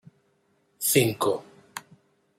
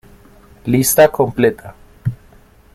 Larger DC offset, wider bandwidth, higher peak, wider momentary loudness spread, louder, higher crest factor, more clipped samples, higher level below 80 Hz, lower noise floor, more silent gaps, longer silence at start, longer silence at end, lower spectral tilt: neither; about the same, 16 kHz vs 16 kHz; second, -6 dBFS vs 0 dBFS; first, 20 LU vs 16 LU; second, -24 LUFS vs -15 LUFS; first, 22 dB vs 16 dB; neither; second, -70 dBFS vs -44 dBFS; first, -68 dBFS vs -46 dBFS; neither; first, 0.8 s vs 0.65 s; about the same, 0.6 s vs 0.6 s; second, -3.5 dB/octave vs -5 dB/octave